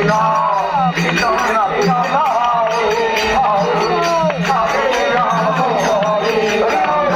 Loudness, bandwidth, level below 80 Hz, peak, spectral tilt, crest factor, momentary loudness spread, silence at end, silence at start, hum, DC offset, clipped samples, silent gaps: -15 LUFS; 16.5 kHz; -44 dBFS; -2 dBFS; -4.5 dB/octave; 14 dB; 1 LU; 0 s; 0 s; none; under 0.1%; under 0.1%; none